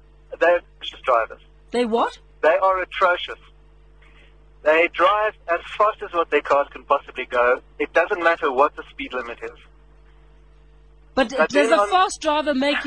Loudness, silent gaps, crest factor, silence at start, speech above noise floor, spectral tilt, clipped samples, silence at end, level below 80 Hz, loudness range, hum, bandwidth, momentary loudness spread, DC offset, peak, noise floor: -20 LUFS; none; 18 dB; 0.3 s; 30 dB; -3 dB/octave; under 0.1%; 0 s; -50 dBFS; 3 LU; none; 10 kHz; 12 LU; 0.1%; -4 dBFS; -50 dBFS